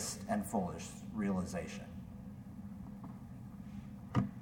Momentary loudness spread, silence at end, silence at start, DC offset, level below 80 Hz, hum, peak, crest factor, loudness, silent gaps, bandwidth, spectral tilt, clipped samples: 13 LU; 0 s; 0 s; under 0.1%; -60 dBFS; none; -20 dBFS; 22 dB; -42 LUFS; none; 18 kHz; -5.5 dB/octave; under 0.1%